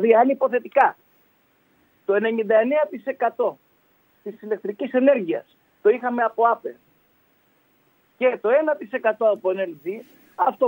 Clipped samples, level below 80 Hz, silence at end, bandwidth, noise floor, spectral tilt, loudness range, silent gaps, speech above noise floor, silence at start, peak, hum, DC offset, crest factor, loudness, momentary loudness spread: under 0.1%; -80 dBFS; 0 s; 16 kHz; -62 dBFS; -7.5 dB/octave; 2 LU; none; 42 dB; 0 s; -4 dBFS; none; under 0.1%; 20 dB; -22 LUFS; 14 LU